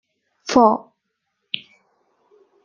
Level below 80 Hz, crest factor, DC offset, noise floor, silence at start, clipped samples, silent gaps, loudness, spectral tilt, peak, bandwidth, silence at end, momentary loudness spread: -60 dBFS; 22 dB; under 0.1%; -75 dBFS; 0.45 s; under 0.1%; none; -19 LUFS; -4 dB/octave; -2 dBFS; 7.4 kHz; 1.85 s; 15 LU